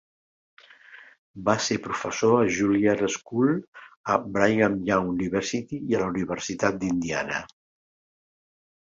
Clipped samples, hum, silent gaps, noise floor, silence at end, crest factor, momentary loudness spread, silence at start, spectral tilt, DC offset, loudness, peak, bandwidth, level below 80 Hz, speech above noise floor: under 0.1%; none; 1.18-1.34 s, 3.68-3.73 s, 3.96-4.04 s; -50 dBFS; 1.35 s; 22 dB; 9 LU; 0.9 s; -5 dB/octave; under 0.1%; -25 LUFS; -4 dBFS; 7.8 kHz; -56 dBFS; 25 dB